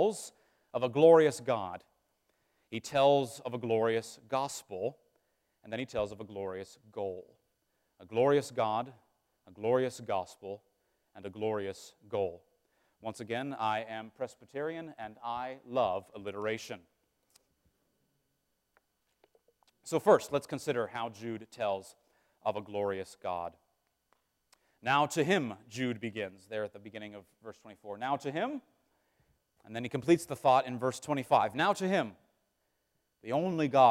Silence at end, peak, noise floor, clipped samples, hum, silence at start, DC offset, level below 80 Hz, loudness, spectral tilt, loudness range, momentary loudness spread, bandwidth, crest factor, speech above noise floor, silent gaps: 0 s; -10 dBFS; -80 dBFS; under 0.1%; none; 0 s; under 0.1%; -74 dBFS; -32 LUFS; -5 dB/octave; 9 LU; 18 LU; 16 kHz; 24 dB; 48 dB; none